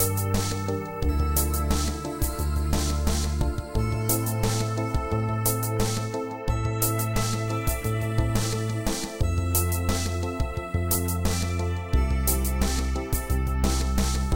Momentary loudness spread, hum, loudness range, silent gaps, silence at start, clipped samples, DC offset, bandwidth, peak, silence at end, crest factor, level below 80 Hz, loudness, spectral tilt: 5 LU; none; 1 LU; none; 0 s; under 0.1%; under 0.1%; 17 kHz; -8 dBFS; 0 s; 16 dB; -30 dBFS; -26 LUFS; -5 dB/octave